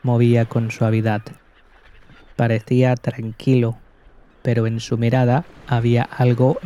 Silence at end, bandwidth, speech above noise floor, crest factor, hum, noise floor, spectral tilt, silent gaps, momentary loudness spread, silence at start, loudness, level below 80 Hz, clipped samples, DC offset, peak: 0 s; 7.4 kHz; 32 dB; 14 dB; none; -50 dBFS; -8 dB/octave; none; 8 LU; 0.05 s; -19 LUFS; -50 dBFS; under 0.1%; under 0.1%; -4 dBFS